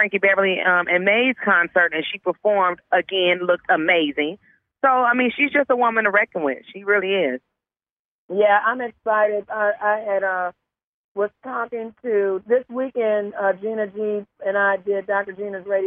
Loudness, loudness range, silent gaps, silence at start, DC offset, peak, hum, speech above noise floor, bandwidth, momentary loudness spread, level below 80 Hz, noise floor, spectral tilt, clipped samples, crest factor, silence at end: -20 LUFS; 5 LU; 7.91-8.29 s, 10.84-11.15 s; 0 s; under 0.1%; -4 dBFS; none; over 70 dB; 3.9 kHz; 10 LU; -70 dBFS; under -90 dBFS; -7 dB/octave; under 0.1%; 16 dB; 0 s